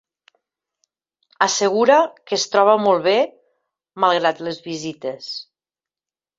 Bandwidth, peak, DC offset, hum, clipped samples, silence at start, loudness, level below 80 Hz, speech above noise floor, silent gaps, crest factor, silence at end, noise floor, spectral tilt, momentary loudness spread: 7.8 kHz; -2 dBFS; under 0.1%; none; under 0.1%; 1.4 s; -18 LUFS; -70 dBFS; over 72 dB; none; 20 dB; 0.95 s; under -90 dBFS; -3 dB/octave; 14 LU